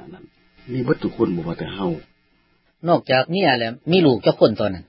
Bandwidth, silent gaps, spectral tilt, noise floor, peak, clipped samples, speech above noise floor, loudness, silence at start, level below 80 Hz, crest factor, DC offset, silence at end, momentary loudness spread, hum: 5.8 kHz; none; -11 dB/octave; -62 dBFS; -2 dBFS; under 0.1%; 43 dB; -20 LUFS; 0 s; -50 dBFS; 20 dB; under 0.1%; 0.05 s; 11 LU; none